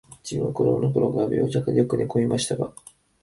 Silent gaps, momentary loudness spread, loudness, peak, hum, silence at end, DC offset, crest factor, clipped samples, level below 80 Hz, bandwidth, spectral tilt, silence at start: none; 7 LU; -24 LUFS; -6 dBFS; none; 0.5 s; under 0.1%; 16 dB; under 0.1%; -54 dBFS; 11.5 kHz; -6.5 dB/octave; 0.1 s